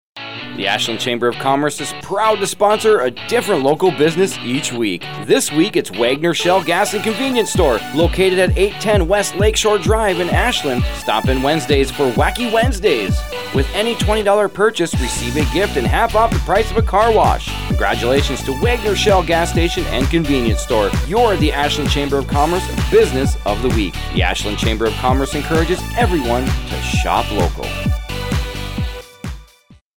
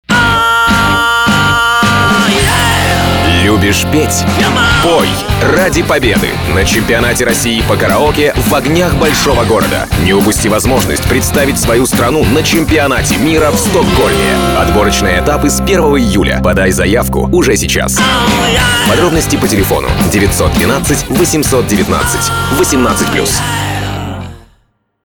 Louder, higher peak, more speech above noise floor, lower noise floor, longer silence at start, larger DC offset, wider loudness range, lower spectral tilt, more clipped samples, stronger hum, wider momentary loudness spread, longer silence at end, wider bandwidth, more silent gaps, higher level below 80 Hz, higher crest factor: second, -16 LUFS vs -9 LUFS; about the same, -2 dBFS vs 0 dBFS; second, 33 dB vs 45 dB; second, -48 dBFS vs -54 dBFS; about the same, 0.05 s vs 0.1 s; first, 1% vs under 0.1%; about the same, 2 LU vs 2 LU; about the same, -4.5 dB/octave vs -4 dB/octave; neither; neither; first, 7 LU vs 3 LU; second, 0 s vs 0.65 s; about the same, over 20 kHz vs over 20 kHz; first, 29.81-29.92 s vs none; about the same, -26 dBFS vs -22 dBFS; about the same, 14 dB vs 10 dB